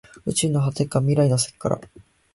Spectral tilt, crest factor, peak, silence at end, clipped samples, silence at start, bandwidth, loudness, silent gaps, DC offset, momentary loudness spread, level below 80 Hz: -5.5 dB/octave; 16 dB; -8 dBFS; 0.5 s; under 0.1%; 0.25 s; 12 kHz; -22 LUFS; none; under 0.1%; 8 LU; -52 dBFS